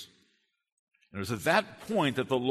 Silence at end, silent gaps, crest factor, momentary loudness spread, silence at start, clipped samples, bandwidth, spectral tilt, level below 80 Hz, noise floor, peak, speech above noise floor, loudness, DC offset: 0 s; 0.72-0.87 s; 22 dB; 16 LU; 0 s; under 0.1%; 13.5 kHz; -5 dB/octave; -66 dBFS; -74 dBFS; -10 dBFS; 45 dB; -30 LUFS; under 0.1%